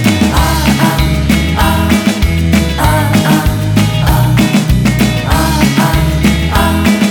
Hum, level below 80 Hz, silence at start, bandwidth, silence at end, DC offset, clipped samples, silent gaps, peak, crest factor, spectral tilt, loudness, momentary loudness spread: none; -18 dBFS; 0 s; 19.5 kHz; 0 s; under 0.1%; under 0.1%; none; 0 dBFS; 10 dB; -5.5 dB/octave; -11 LUFS; 2 LU